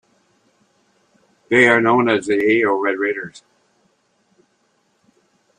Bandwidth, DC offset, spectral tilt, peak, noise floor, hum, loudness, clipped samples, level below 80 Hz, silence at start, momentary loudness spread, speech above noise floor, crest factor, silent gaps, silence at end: 10 kHz; under 0.1%; -5.5 dB/octave; -2 dBFS; -64 dBFS; none; -16 LUFS; under 0.1%; -64 dBFS; 1.5 s; 10 LU; 48 dB; 20 dB; none; 2.2 s